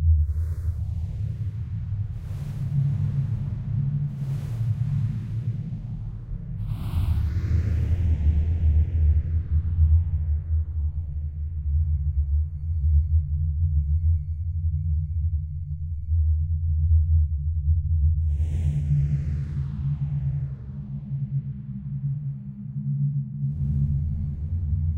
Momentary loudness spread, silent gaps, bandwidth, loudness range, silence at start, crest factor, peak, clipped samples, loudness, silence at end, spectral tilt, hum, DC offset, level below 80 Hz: 10 LU; none; 3 kHz; 5 LU; 0 s; 14 dB; -10 dBFS; under 0.1%; -26 LUFS; 0 s; -10 dB/octave; none; under 0.1%; -28 dBFS